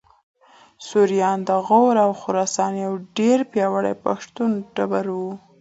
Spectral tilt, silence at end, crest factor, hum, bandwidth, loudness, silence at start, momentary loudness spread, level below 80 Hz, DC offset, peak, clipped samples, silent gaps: -5.5 dB/octave; 0.25 s; 18 dB; none; 8 kHz; -21 LUFS; 0.8 s; 10 LU; -68 dBFS; under 0.1%; -4 dBFS; under 0.1%; none